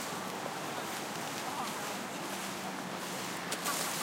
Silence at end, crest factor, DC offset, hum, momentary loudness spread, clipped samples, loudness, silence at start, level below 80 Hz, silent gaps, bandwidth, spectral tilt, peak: 0 s; 18 dB; under 0.1%; none; 5 LU; under 0.1%; -37 LUFS; 0 s; -76 dBFS; none; 17 kHz; -2.5 dB/octave; -20 dBFS